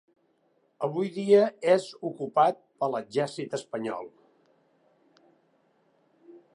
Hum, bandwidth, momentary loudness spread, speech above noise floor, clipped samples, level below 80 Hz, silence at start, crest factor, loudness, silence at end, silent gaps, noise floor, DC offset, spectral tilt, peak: none; 11 kHz; 14 LU; 43 dB; under 0.1%; -84 dBFS; 0.8 s; 20 dB; -27 LUFS; 0.15 s; none; -69 dBFS; under 0.1%; -6 dB/octave; -10 dBFS